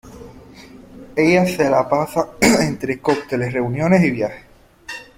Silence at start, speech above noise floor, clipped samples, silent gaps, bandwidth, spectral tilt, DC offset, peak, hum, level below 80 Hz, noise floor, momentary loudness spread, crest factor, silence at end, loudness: 0.05 s; 24 dB; under 0.1%; none; 16.5 kHz; -5.5 dB/octave; under 0.1%; 0 dBFS; none; -48 dBFS; -41 dBFS; 10 LU; 18 dB; 0.15 s; -18 LUFS